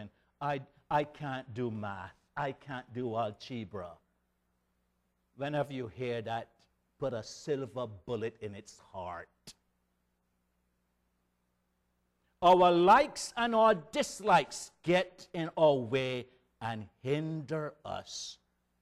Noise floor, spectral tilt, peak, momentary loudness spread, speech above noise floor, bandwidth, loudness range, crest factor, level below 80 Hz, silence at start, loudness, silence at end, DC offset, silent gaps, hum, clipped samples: -78 dBFS; -5 dB/octave; -12 dBFS; 18 LU; 46 dB; 13.5 kHz; 14 LU; 22 dB; -66 dBFS; 0 s; -32 LUFS; 0.5 s; under 0.1%; none; 60 Hz at -65 dBFS; under 0.1%